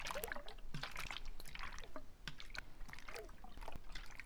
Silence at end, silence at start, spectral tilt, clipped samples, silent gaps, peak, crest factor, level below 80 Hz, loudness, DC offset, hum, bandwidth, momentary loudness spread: 0 s; 0 s; -3 dB/octave; under 0.1%; none; -22 dBFS; 24 dB; -52 dBFS; -51 LUFS; under 0.1%; none; over 20 kHz; 9 LU